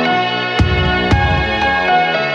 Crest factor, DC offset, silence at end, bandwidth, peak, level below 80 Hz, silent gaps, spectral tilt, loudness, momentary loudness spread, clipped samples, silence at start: 14 dB; under 0.1%; 0 s; 9 kHz; 0 dBFS; -24 dBFS; none; -6 dB/octave; -14 LUFS; 2 LU; under 0.1%; 0 s